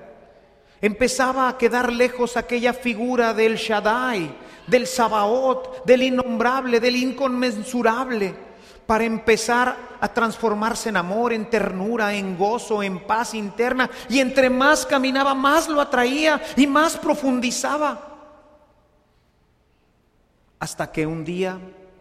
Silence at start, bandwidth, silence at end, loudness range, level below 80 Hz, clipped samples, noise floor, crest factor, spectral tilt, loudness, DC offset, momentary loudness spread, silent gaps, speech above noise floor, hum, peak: 0 s; 15.5 kHz; 0.3 s; 8 LU; -52 dBFS; under 0.1%; -62 dBFS; 18 dB; -4 dB/octave; -21 LUFS; under 0.1%; 8 LU; none; 41 dB; none; -2 dBFS